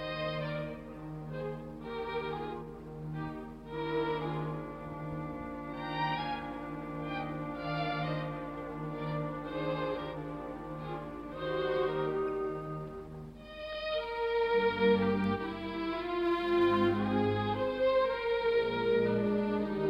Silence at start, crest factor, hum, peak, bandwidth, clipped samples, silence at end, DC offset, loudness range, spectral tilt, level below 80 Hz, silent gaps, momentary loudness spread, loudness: 0 s; 18 dB; none; -16 dBFS; 9.6 kHz; under 0.1%; 0 s; under 0.1%; 8 LU; -8 dB/octave; -56 dBFS; none; 13 LU; -34 LUFS